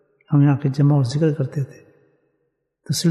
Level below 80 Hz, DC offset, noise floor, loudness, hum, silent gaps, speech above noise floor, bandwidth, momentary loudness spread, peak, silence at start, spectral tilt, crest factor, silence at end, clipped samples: -64 dBFS; under 0.1%; -71 dBFS; -19 LUFS; none; none; 54 dB; 12.5 kHz; 9 LU; -6 dBFS; 0.3 s; -7 dB/octave; 14 dB; 0 s; under 0.1%